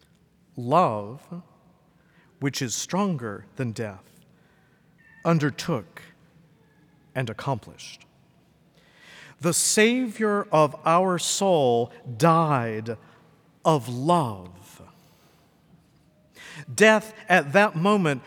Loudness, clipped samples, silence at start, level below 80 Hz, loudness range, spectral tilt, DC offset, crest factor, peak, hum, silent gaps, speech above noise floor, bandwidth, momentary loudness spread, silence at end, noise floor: -23 LUFS; under 0.1%; 0.55 s; -70 dBFS; 9 LU; -4.5 dB/octave; under 0.1%; 22 dB; -4 dBFS; none; none; 37 dB; 19.5 kHz; 20 LU; 0.05 s; -60 dBFS